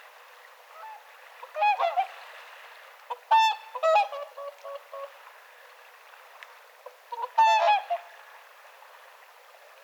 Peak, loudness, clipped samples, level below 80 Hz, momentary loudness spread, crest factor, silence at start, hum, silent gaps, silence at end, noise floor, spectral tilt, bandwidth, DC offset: -12 dBFS; -25 LUFS; under 0.1%; under -90 dBFS; 27 LU; 18 dB; 0.75 s; none; none; 1.45 s; -53 dBFS; 5.5 dB/octave; over 20 kHz; under 0.1%